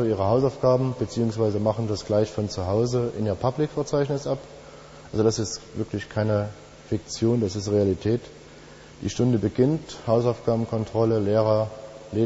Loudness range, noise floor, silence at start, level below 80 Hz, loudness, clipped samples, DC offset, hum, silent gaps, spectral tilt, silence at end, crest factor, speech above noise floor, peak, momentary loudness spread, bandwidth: 3 LU; -46 dBFS; 0 s; -50 dBFS; -25 LUFS; under 0.1%; under 0.1%; none; none; -7 dB/octave; 0 s; 18 dB; 22 dB; -8 dBFS; 10 LU; 8 kHz